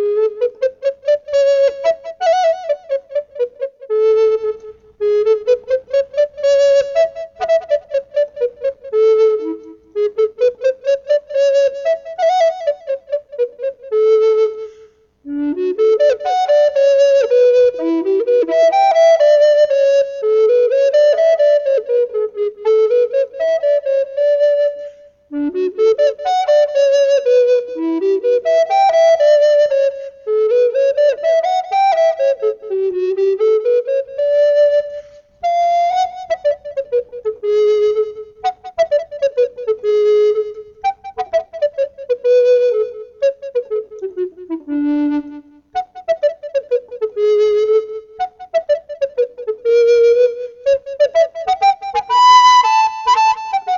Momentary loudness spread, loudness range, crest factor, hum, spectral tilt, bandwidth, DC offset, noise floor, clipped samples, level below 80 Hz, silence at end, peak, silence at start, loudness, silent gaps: 11 LU; 6 LU; 14 dB; none; -2.5 dB/octave; 7.4 kHz; under 0.1%; -46 dBFS; under 0.1%; -60 dBFS; 0 s; 0 dBFS; 0 s; -15 LUFS; none